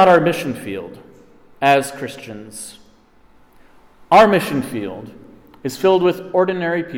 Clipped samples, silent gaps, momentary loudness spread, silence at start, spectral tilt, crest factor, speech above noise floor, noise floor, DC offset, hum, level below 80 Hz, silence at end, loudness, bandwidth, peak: under 0.1%; none; 21 LU; 0 s; -5.5 dB/octave; 16 dB; 33 dB; -50 dBFS; under 0.1%; none; -54 dBFS; 0 s; -17 LUFS; 17.5 kHz; -2 dBFS